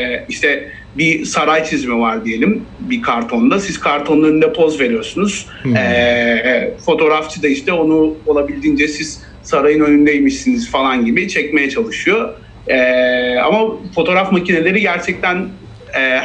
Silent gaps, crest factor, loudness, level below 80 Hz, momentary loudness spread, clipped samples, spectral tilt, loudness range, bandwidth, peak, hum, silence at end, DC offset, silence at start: none; 12 dB; -14 LUFS; -42 dBFS; 6 LU; under 0.1%; -5 dB/octave; 1 LU; 9.8 kHz; -2 dBFS; none; 0 s; under 0.1%; 0 s